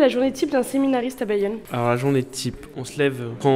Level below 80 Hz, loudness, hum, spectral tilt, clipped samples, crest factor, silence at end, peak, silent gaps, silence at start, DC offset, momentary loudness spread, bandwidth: -52 dBFS; -23 LUFS; none; -6 dB/octave; under 0.1%; 16 dB; 0 s; -4 dBFS; none; 0 s; under 0.1%; 8 LU; 16 kHz